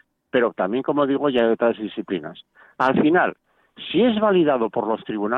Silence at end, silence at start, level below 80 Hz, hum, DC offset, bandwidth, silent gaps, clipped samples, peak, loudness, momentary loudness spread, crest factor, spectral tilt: 0 s; 0.35 s; -60 dBFS; none; under 0.1%; 6 kHz; none; under 0.1%; -6 dBFS; -21 LUFS; 11 LU; 16 dB; -8 dB/octave